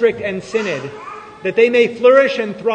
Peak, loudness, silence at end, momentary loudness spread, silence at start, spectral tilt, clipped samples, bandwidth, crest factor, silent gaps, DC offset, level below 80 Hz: 0 dBFS; -15 LUFS; 0 s; 17 LU; 0 s; -5 dB/octave; under 0.1%; 8.8 kHz; 16 dB; none; under 0.1%; -58 dBFS